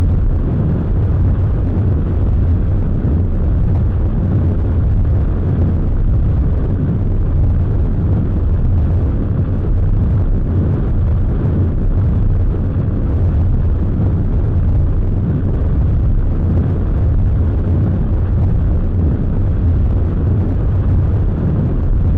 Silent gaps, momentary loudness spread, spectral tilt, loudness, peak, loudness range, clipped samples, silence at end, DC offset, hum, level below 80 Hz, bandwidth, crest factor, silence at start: none; 2 LU; -12 dB/octave; -16 LUFS; -8 dBFS; 0 LU; under 0.1%; 0 s; 0.5%; none; -16 dBFS; 3.4 kHz; 4 dB; 0 s